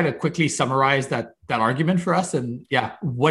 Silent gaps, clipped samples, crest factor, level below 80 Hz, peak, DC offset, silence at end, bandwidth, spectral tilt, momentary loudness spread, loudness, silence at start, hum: none; under 0.1%; 18 dB; -60 dBFS; -4 dBFS; under 0.1%; 0 s; 12 kHz; -5 dB/octave; 8 LU; -22 LUFS; 0 s; none